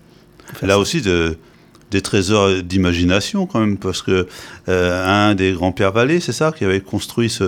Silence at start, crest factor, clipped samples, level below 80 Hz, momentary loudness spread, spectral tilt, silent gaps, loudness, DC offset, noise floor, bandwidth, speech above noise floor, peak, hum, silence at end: 0.45 s; 18 dB; under 0.1%; -42 dBFS; 8 LU; -5 dB/octave; none; -17 LUFS; under 0.1%; -44 dBFS; 18 kHz; 27 dB; 0 dBFS; none; 0 s